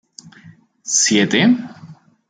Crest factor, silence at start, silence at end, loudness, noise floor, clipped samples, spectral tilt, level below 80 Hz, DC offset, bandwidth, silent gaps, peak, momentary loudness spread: 16 dB; 0.25 s; 0.35 s; -15 LUFS; -46 dBFS; under 0.1%; -3 dB/octave; -64 dBFS; under 0.1%; 10 kHz; none; -2 dBFS; 19 LU